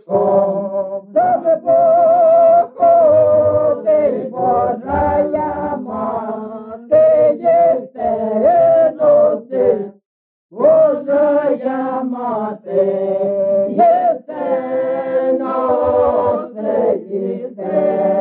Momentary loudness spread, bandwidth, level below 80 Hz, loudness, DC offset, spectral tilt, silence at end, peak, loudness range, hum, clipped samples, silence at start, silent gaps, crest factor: 11 LU; 3.7 kHz; -48 dBFS; -15 LUFS; under 0.1%; -7.5 dB/octave; 0 s; -2 dBFS; 5 LU; none; under 0.1%; 0.1 s; 10.05-10.49 s; 12 dB